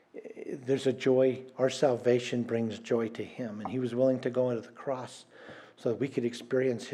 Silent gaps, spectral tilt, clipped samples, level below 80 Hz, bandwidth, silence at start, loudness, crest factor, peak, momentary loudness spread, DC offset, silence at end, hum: none; -6 dB/octave; under 0.1%; -84 dBFS; 11.5 kHz; 0.15 s; -31 LUFS; 18 dB; -12 dBFS; 16 LU; under 0.1%; 0 s; none